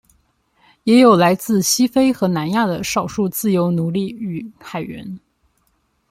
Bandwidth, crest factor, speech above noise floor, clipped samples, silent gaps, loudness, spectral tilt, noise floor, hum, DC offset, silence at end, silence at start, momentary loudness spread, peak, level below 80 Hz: 16 kHz; 16 dB; 48 dB; under 0.1%; none; -17 LUFS; -5 dB/octave; -65 dBFS; none; under 0.1%; 0.9 s; 0.85 s; 18 LU; -2 dBFS; -54 dBFS